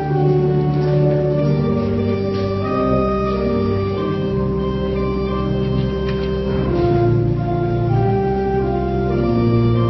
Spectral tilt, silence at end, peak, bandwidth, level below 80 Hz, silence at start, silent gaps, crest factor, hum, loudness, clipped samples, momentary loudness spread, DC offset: -10 dB/octave; 0 s; -4 dBFS; 6 kHz; -30 dBFS; 0 s; none; 12 dB; none; -18 LUFS; under 0.1%; 4 LU; under 0.1%